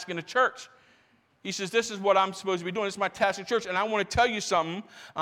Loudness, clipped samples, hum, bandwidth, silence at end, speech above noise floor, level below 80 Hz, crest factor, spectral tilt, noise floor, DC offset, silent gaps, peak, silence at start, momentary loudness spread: -27 LUFS; under 0.1%; none; 16 kHz; 0 s; 37 dB; -56 dBFS; 18 dB; -3.5 dB/octave; -65 dBFS; under 0.1%; none; -10 dBFS; 0 s; 11 LU